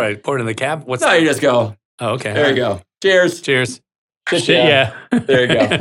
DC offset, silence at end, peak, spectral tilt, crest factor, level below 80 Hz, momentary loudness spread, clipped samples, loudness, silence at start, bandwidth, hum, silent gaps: under 0.1%; 0 s; 0 dBFS; -4.5 dB/octave; 16 dB; -58 dBFS; 10 LU; under 0.1%; -15 LUFS; 0 s; 16.5 kHz; none; 1.85-1.98 s, 3.98-4.09 s, 4.17-4.21 s